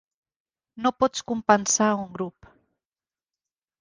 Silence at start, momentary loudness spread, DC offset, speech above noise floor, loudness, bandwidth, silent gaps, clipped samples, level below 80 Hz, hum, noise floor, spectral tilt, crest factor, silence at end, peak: 0.75 s; 14 LU; under 0.1%; over 66 dB; -24 LUFS; 10.5 kHz; none; under 0.1%; -62 dBFS; none; under -90 dBFS; -3 dB/octave; 24 dB; 1.5 s; -2 dBFS